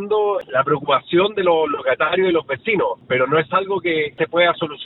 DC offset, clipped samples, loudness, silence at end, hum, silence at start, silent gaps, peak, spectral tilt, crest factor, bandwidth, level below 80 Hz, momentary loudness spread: under 0.1%; under 0.1%; -18 LUFS; 0 s; none; 0 s; none; -2 dBFS; -8.5 dB/octave; 18 dB; 4.1 kHz; -58 dBFS; 4 LU